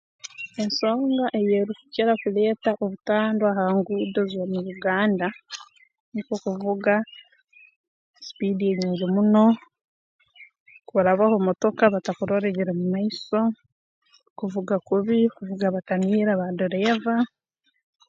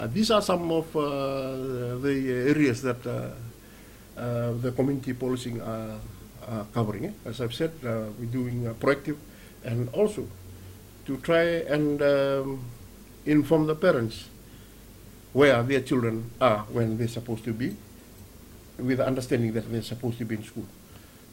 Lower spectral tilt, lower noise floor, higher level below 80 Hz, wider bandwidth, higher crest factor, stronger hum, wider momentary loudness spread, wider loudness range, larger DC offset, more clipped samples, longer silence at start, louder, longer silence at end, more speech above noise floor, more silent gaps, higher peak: about the same, -7 dB/octave vs -6.5 dB/octave; first, -55 dBFS vs -49 dBFS; second, -70 dBFS vs -52 dBFS; second, 7.6 kHz vs 16.5 kHz; about the same, 22 dB vs 22 dB; neither; second, 10 LU vs 20 LU; about the same, 4 LU vs 6 LU; neither; neither; first, 0.4 s vs 0 s; first, -23 LUFS vs -27 LUFS; first, 0.8 s vs 0 s; first, 33 dB vs 23 dB; first, 6.00-6.12 s, 7.76-8.14 s, 9.84-10.19 s, 10.60-10.66 s, 13.72-14.02 s, 14.30-14.36 s vs none; first, -2 dBFS vs -6 dBFS